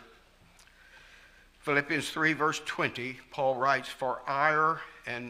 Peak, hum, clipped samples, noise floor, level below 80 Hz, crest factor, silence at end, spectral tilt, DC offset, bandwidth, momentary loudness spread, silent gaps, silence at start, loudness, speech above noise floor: -10 dBFS; none; under 0.1%; -59 dBFS; -66 dBFS; 20 dB; 0 s; -4 dB/octave; under 0.1%; 15.5 kHz; 11 LU; none; 0 s; -29 LUFS; 29 dB